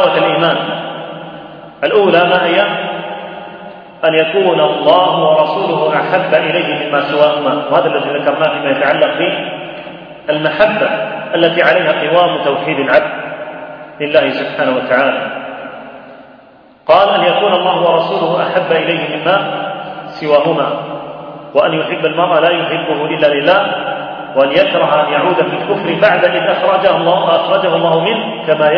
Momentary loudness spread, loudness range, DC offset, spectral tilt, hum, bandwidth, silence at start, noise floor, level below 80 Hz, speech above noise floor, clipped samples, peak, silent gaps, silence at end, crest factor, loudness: 15 LU; 3 LU; under 0.1%; -7.5 dB/octave; none; 5.4 kHz; 0 s; -42 dBFS; -58 dBFS; 30 dB; under 0.1%; 0 dBFS; none; 0 s; 12 dB; -12 LUFS